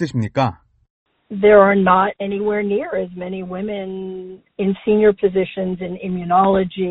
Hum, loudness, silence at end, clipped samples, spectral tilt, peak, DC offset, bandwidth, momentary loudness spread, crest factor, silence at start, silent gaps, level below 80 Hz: none; -18 LUFS; 0 s; under 0.1%; -6 dB/octave; 0 dBFS; under 0.1%; 8 kHz; 16 LU; 18 dB; 0 s; 0.90-1.06 s; -50 dBFS